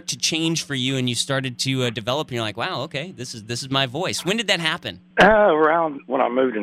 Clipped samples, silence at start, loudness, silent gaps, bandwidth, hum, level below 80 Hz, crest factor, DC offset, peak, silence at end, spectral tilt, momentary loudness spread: under 0.1%; 0.1 s; -21 LUFS; none; 15.5 kHz; none; -50 dBFS; 18 dB; under 0.1%; -4 dBFS; 0 s; -3.5 dB/octave; 13 LU